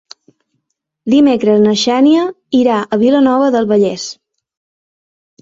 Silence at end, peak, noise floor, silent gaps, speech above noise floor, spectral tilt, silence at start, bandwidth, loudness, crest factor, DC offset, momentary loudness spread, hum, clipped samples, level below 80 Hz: 1.3 s; -2 dBFS; -71 dBFS; none; 61 dB; -5.5 dB/octave; 1.05 s; 7.8 kHz; -12 LUFS; 12 dB; under 0.1%; 6 LU; none; under 0.1%; -56 dBFS